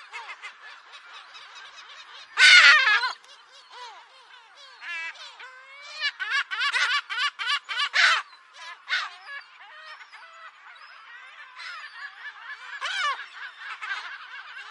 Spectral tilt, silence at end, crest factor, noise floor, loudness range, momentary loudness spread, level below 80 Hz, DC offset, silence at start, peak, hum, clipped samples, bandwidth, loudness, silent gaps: 5.5 dB/octave; 0 s; 26 dB; -51 dBFS; 17 LU; 26 LU; -88 dBFS; under 0.1%; 0 s; -2 dBFS; none; under 0.1%; 11.5 kHz; -21 LUFS; none